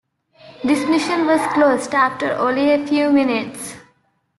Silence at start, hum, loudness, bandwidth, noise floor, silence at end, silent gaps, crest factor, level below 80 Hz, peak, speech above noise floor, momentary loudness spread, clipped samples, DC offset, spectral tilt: 0.45 s; none; -17 LUFS; 12.5 kHz; -62 dBFS; 0.6 s; none; 14 dB; -60 dBFS; -4 dBFS; 45 dB; 9 LU; under 0.1%; under 0.1%; -4 dB/octave